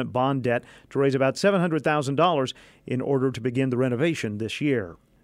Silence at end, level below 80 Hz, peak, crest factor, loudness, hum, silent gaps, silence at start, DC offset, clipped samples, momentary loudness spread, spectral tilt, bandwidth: 0.3 s; -62 dBFS; -8 dBFS; 16 dB; -24 LUFS; none; none; 0 s; under 0.1%; under 0.1%; 8 LU; -6.5 dB/octave; 13 kHz